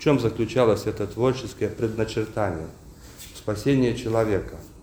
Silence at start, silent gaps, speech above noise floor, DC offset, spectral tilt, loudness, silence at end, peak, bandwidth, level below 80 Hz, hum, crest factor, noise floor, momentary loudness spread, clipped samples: 0 s; none; 19 dB; under 0.1%; -6.5 dB/octave; -25 LUFS; 0 s; -6 dBFS; over 20 kHz; -46 dBFS; none; 18 dB; -43 dBFS; 13 LU; under 0.1%